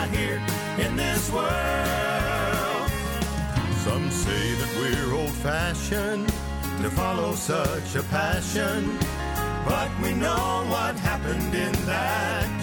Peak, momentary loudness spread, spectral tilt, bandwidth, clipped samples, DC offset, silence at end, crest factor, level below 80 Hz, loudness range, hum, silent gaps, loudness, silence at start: -12 dBFS; 3 LU; -4.5 dB/octave; 19.5 kHz; under 0.1%; under 0.1%; 0 s; 14 dB; -36 dBFS; 1 LU; none; none; -26 LUFS; 0 s